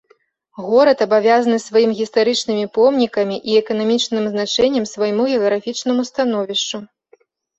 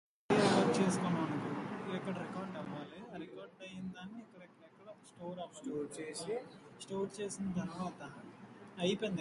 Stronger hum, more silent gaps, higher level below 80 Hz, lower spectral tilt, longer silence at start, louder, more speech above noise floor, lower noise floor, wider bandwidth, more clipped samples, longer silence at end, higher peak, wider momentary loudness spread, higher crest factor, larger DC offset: neither; neither; first, -60 dBFS vs -74 dBFS; second, -4 dB/octave vs -5.5 dB/octave; first, 0.6 s vs 0.3 s; first, -17 LUFS vs -38 LUFS; first, 41 dB vs 19 dB; about the same, -58 dBFS vs -59 dBFS; second, 8.2 kHz vs 11.5 kHz; neither; first, 0.75 s vs 0 s; first, -2 dBFS vs -16 dBFS; second, 7 LU vs 22 LU; second, 16 dB vs 22 dB; neither